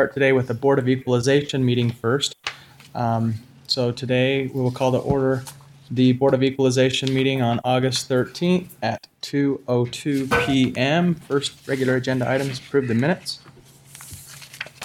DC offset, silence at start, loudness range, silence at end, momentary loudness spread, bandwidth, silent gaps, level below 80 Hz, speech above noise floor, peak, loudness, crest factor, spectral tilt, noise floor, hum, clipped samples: under 0.1%; 0 s; 3 LU; 0 s; 13 LU; 16 kHz; none; -54 dBFS; 27 dB; -4 dBFS; -21 LUFS; 16 dB; -5.5 dB/octave; -48 dBFS; none; under 0.1%